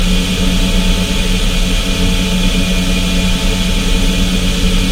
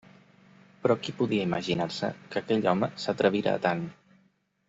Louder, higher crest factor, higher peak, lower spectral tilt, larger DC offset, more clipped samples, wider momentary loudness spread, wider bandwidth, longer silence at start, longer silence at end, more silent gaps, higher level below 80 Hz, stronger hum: first, -14 LUFS vs -28 LUFS; second, 12 dB vs 20 dB; first, 0 dBFS vs -10 dBFS; second, -4 dB/octave vs -6 dB/octave; neither; neither; second, 1 LU vs 8 LU; first, 16.5 kHz vs 8 kHz; second, 0 s vs 0.85 s; second, 0 s vs 0.75 s; neither; first, -14 dBFS vs -66 dBFS; neither